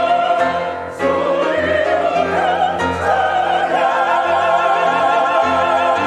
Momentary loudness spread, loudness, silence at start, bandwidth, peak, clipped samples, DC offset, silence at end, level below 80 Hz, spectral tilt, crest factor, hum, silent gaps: 3 LU; -16 LUFS; 0 s; 11 kHz; -2 dBFS; under 0.1%; under 0.1%; 0 s; -54 dBFS; -4.5 dB/octave; 14 dB; none; none